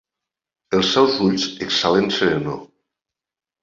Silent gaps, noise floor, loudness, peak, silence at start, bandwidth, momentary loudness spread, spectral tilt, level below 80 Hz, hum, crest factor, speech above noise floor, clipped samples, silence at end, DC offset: none; -89 dBFS; -18 LUFS; -2 dBFS; 0.7 s; 7.6 kHz; 8 LU; -4.5 dB/octave; -54 dBFS; none; 20 dB; 71 dB; under 0.1%; 0.95 s; under 0.1%